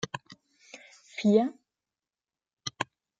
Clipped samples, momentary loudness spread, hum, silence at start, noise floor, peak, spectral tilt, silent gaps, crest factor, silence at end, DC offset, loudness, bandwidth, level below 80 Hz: under 0.1%; 25 LU; none; 0.05 s; under -90 dBFS; -10 dBFS; -5.5 dB/octave; 2.53-2.57 s; 22 dB; 0.35 s; under 0.1%; -29 LUFS; 7.8 kHz; -74 dBFS